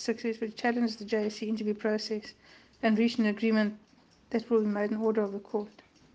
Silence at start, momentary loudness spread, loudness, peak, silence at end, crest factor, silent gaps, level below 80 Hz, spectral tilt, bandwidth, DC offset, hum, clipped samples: 0 s; 9 LU; -30 LUFS; -14 dBFS; 0.45 s; 16 dB; none; -72 dBFS; -6 dB/octave; 8 kHz; under 0.1%; none; under 0.1%